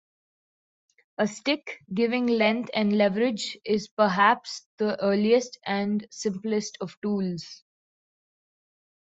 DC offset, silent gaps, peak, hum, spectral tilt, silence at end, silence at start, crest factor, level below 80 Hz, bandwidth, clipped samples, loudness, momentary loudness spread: under 0.1%; 3.91-3.97 s, 4.66-4.78 s, 6.97-7.02 s; -6 dBFS; none; -5 dB/octave; 1.45 s; 1.2 s; 20 dB; -70 dBFS; 8 kHz; under 0.1%; -26 LUFS; 11 LU